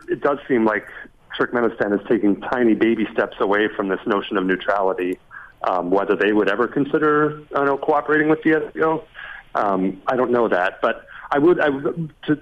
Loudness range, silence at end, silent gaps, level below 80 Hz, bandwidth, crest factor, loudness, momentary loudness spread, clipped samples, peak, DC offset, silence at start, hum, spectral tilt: 2 LU; 0 s; none; -54 dBFS; 6.6 kHz; 14 dB; -20 LUFS; 9 LU; under 0.1%; -6 dBFS; under 0.1%; 0.1 s; none; -7.5 dB/octave